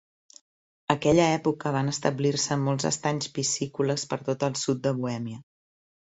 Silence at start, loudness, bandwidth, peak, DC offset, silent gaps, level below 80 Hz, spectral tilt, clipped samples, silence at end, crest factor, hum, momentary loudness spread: 0.9 s; -26 LUFS; 8.2 kHz; -2 dBFS; under 0.1%; none; -60 dBFS; -4.5 dB/octave; under 0.1%; 0.75 s; 24 dB; none; 9 LU